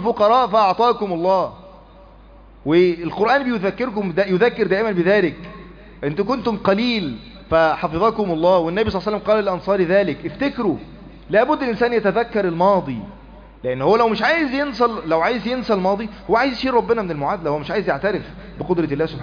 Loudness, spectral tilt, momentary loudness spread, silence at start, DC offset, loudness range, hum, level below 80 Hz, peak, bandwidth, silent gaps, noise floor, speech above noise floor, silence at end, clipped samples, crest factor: -19 LUFS; -7.5 dB/octave; 9 LU; 0 s; under 0.1%; 2 LU; none; -44 dBFS; -4 dBFS; 5.2 kHz; none; -44 dBFS; 26 dB; 0 s; under 0.1%; 14 dB